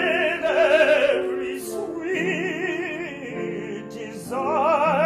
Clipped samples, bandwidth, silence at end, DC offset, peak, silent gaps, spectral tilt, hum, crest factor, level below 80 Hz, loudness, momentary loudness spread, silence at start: under 0.1%; 15 kHz; 0 s; under 0.1%; -6 dBFS; none; -4.5 dB/octave; none; 16 dB; -62 dBFS; -22 LUFS; 14 LU; 0 s